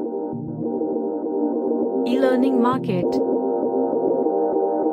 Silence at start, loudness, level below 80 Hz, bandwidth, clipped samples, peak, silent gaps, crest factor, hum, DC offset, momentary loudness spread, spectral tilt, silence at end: 0 s; -22 LUFS; -64 dBFS; 10 kHz; under 0.1%; -6 dBFS; none; 14 dB; none; under 0.1%; 8 LU; -8.5 dB/octave; 0 s